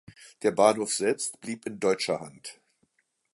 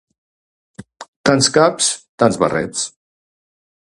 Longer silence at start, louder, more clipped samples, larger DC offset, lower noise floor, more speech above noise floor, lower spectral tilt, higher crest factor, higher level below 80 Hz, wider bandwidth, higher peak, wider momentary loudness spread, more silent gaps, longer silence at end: second, 0.2 s vs 1 s; second, -27 LUFS vs -16 LUFS; neither; neither; second, -72 dBFS vs under -90 dBFS; second, 45 dB vs over 75 dB; about the same, -3 dB/octave vs -3.5 dB/octave; about the same, 22 dB vs 20 dB; second, -72 dBFS vs -54 dBFS; about the same, 11.5 kHz vs 11.5 kHz; second, -6 dBFS vs 0 dBFS; first, 18 LU vs 11 LU; second, none vs 1.08-1.24 s, 2.09-2.18 s; second, 0.8 s vs 1.1 s